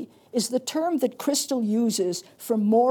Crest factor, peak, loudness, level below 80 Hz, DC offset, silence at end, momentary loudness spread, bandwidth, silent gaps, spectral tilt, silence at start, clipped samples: 14 dB; -10 dBFS; -25 LUFS; -80 dBFS; under 0.1%; 0 s; 6 LU; 19.5 kHz; none; -4.5 dB/octave; 0 s; under 0.1%